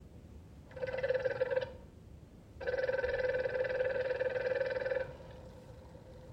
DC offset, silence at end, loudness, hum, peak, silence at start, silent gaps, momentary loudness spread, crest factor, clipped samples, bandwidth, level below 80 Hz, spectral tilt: under 0.1%; 0 s; -36 LUFS; none; -20 dBFS; 0 s; none; 20 LU; 16 dB; under 0.1%; 7.6 kHz; -58 dBFS; -6 dB/octave